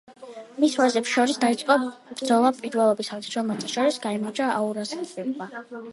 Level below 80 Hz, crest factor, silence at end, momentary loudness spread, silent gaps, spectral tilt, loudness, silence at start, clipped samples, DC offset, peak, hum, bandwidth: -76 dBFS; 18 dB; 0 s; 13 LU; none; -4 dB/octave; -24 LUFS; 0.1 s; under 0.1%; under 0.1%; -6 dBFS; none; 11.5 kHz